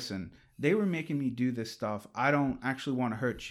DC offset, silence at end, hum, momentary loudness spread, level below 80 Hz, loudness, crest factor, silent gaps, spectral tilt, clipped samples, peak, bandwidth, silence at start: under 0.1%; 0 s; none; 9 LU; -62 dBFS; -32 LUFS; 18 dB; none; -6.5 dB/octave; under 0.1%; -14 dBFS; 13.5 kHz; 0 s